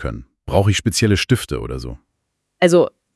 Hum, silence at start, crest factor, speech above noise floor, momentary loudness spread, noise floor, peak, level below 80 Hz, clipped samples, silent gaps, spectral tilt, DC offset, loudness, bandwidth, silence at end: none; 0 s; 18 dB; 56 dB; 15 LU; -73 dBFS; -2 dBFS; -38 dBFS; under 0.1%; none; -5 dB/octave; under 0.1%; -17 LUFS; 12 kHz; 0.25 s